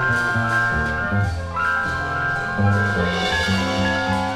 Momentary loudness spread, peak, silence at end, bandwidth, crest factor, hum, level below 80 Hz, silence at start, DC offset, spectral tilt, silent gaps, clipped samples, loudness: 3 LU; -6 dBFS; 0 s; 13 kHz; 14 dB; none; -36 dBFS; 0 s; under 0.1%; -5.5 dB/octave; none; under 0.1%; -20 LUFS